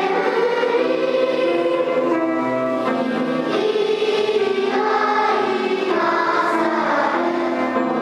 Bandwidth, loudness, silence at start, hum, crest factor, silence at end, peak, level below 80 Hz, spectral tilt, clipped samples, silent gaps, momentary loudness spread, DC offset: 11.5 kHz; -19 LUFS; 0 s; none; 12 dB; 0 s; -6 dBFS; -74 dBFS; -5 dB/octave; under 0.1%; none; 3 LU; under 0.1%